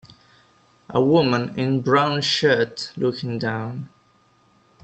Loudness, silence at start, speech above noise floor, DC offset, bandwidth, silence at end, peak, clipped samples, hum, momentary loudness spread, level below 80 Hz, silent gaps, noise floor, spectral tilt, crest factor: -21 LUFS; 0.9 s; 38 dB; under 0.1%; 8.8 kHz; 0.95 s; -4 dBFS; under 0.1%; none; 11 LU; -62 dBFS; none; -59 dBFS; -5.5 dB/octave; 20 dB